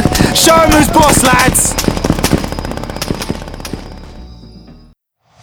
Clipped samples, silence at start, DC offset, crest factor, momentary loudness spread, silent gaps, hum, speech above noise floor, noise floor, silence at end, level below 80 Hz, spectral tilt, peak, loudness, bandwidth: 0.4%; 0 s; under 0.1%; 12 dB; 18 LU; none; none; 42 dB; -51 dBFS; 0.7 s; -24 dBFS; -3.5 dB/octave; 0 dBFS; -10 LUFS; over 20 kHz